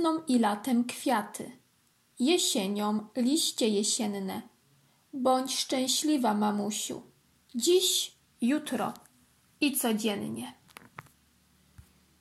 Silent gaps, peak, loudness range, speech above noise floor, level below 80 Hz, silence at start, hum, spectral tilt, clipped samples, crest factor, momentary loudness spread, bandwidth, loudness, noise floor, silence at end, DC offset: none; -14 dBFS; 4 LU; 40 dB; -76 dBFS; 0 s; none; -3 dB/octave; under 0.1%; 18 dB; 15 LU; 16.5 kHz; -28 LUFS; -68 dBFS; 1.7 s; under 0.1%